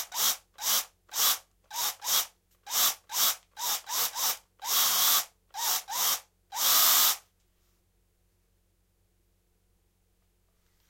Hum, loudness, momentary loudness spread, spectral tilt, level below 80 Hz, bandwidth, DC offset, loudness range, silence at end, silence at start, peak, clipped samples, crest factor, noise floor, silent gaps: none; -26 LUFS; 12 LU; 3 dB/octave; -72 dBFS; 16.5 kHz; under 0.1%; 4 LU; 3.7 s; 0 s; -10 dBFS; under 0.1%; 22 dB; -71 dBFS; none